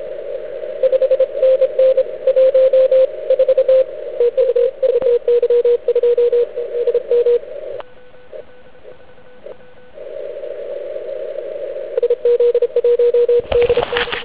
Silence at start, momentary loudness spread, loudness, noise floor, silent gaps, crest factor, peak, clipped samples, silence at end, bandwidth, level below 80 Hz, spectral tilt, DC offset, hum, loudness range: 0 s; 14 LU; -15 LUFS; -44 dBFS; none; 14 dB; -2 dBFS; under 0.1%; 0 s; 4 kHz; -48 dBFS; -7.5 dB/octave; 1%; none; 16 LU